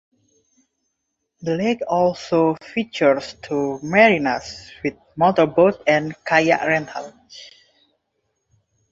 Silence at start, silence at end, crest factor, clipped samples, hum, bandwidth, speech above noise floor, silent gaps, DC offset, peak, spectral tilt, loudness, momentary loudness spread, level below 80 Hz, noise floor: 1.4 s; 1.45 s; 20 dB; under 0.1%; none; 7.8 kHz; 57 dB; none; under 0.1%; -2 dBFS; -5.5 dB/octave; -19 LUFS; 17 LU; -58 dBFS; -76 dBFS